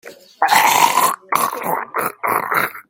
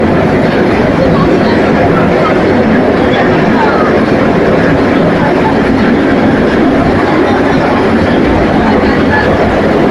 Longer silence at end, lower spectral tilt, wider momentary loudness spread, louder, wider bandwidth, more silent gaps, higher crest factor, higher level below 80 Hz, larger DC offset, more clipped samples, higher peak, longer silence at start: about the same, 0.1 s vs 0 s; second, -1 dB/octave vs -7.5 dB/octave; first, 9 LU vs 1 LU; second, -16 LUFS vs -8 LUFS; first, 17 kHz vs 12 kHz; neither; first, 18 dB vs 8 dB; second, -66 dBFS vs -26 dBFS; neither; neither; about the same, 0 dBFS vs 0 dBFS; about the same, 0.05 s vs 0 s